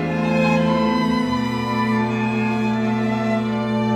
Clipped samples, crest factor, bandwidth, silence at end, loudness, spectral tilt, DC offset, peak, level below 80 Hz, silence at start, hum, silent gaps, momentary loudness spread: under 0.1%; 12 dB; 11.5 kHz; 0 s; -20 LUFS; -7 dB/octave; under 0.1%; -6 dBFS; -46 dBFS; 0 s; none; none; 4 LU